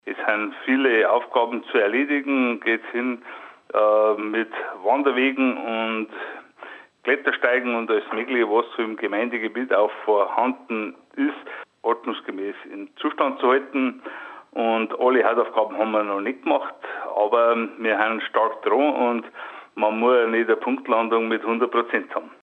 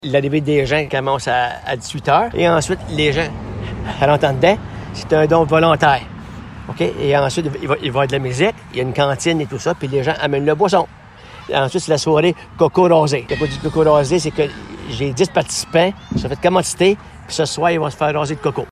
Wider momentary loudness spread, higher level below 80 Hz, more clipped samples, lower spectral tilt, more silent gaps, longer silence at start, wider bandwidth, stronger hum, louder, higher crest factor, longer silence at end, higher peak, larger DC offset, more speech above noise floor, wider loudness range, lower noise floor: about the same, 13 LU vs 11 LU; second, -82 dBFS vs -40 dBFS; neither; first, -6.5 dB/octave vs -5 dB/octave; neither; about the same, 0.05 s vs 0.05 s; second, 4.3 kHz vs 13.5 kHz; neither; second, -22 LUFS vs -17 LUFS; about the same, 18 dB vs 16 dB; about the same, 0.1 s vs 0 s; second, -4 dBFS vs 0 dBFS; neither; about the same, 21 dB vs 22 dB; about the same, 4 LU vs 2 LU; first, -43 dBFS vs -38 dBFS